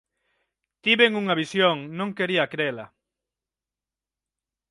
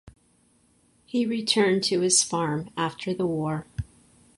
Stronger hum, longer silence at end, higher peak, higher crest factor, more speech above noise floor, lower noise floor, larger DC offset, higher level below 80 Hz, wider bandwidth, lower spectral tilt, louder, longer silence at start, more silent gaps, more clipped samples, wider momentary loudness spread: neither; first, 1.85 s vs 0.55 s; about the same, -6 dBFS vs -6 dBFS; about the same, 22 dB vs 20 dB; first, 67 dB vs 39 dB; first, -90 dBFS vs -63 dBFS; neither; second, -72 dBFS vs -52 dBFS; about the same, 11.5 kHz vs 11.5 kHz; first, -5 dB/octave vs -3.5 dB/octave; about the same, -23 LUFS vs -24 LUFS; first, 0.85 s vs 0.05 s; neither; neither; second, 10 LU vs 13 LU